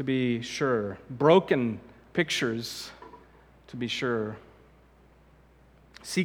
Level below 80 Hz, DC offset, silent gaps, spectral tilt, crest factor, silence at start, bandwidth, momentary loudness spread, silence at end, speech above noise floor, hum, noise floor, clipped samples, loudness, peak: -62 dBFS; under 0.1%; none; -5 dB/octave; 22 dB; 0 s; 18 kHz; 21 LU; 0 s; 31 dB; none; -58 dBFS; under 0.1%; -28 LUFS; -8 dBFS